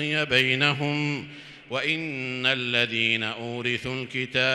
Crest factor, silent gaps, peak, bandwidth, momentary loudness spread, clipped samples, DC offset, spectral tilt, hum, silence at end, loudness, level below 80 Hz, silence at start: 20 dB; none; -6 dBFS; 14.5 kHz; 9 LU; under 0.1%; under 0.1%; -4.5 dB/octave; none; 0 s; -24 LUFS; -62 dBFS; 0 s